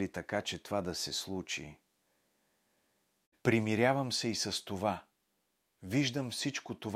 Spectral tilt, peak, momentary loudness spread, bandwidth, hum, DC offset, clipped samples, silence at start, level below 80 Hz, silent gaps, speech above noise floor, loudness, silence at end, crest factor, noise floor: -4 dB/octave; -12 dBFS; 10 LU; 16 kHz; none; under 0.1%; under 0.1%; 0 s; -68 dBFS; 3.26-3.32 s; 45 dB; -34 LUFS; 0 s; 24 dB; -80 dBFS